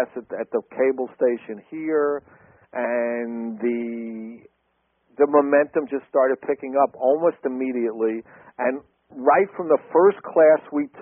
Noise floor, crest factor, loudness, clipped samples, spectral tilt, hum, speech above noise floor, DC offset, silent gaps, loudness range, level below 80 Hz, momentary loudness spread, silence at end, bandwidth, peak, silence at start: -70 dBFS; 18 dB; -22 LUFS; under 0.1%; -0.5 dB/octave; none; 48 dB; under 0.1%; none; 6 LU; -72 dBFS; 14 LU; 0 s; 3.4 kHz; -4 dBFS; 0 s